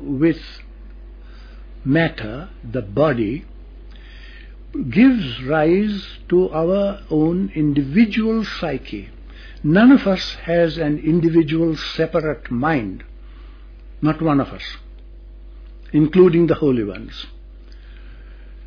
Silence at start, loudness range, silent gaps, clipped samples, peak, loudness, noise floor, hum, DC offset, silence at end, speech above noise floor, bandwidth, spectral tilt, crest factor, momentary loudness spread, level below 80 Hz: 0 s; 6 LU; none; under 0.1%; -2 dBFS; -18 LUFS; -38 dBFS; none; under 0.1%; 0 s; 21 dB; 5.4 kHz; -8 dB/octave; 18 dB; 19 LU; -38 dBFS